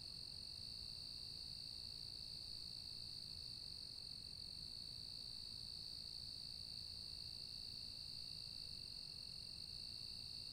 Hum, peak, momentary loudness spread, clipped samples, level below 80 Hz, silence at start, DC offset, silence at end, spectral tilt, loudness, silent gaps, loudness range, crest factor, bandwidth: none; -38 dBFS; 1 LU; under 0.1%; -68 dBFS; 0 s; under 0.1%; 0 s; -2 dB/octave; -49 LUFS; none; 0 LU; 14 dB; 16 kHz